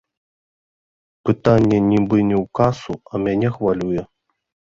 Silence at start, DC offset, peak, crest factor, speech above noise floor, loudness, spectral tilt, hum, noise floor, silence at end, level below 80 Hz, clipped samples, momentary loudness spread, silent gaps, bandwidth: 1.25 s; under 0.1%; -2 dBFS; 18 dB; over 73 dB; -19 LUFS; -8.5 dB/octave; none; under -90 dBFS; 0.65 s; -46 dBFS; under 0.1%; 11 LU; none; 7.6 kHz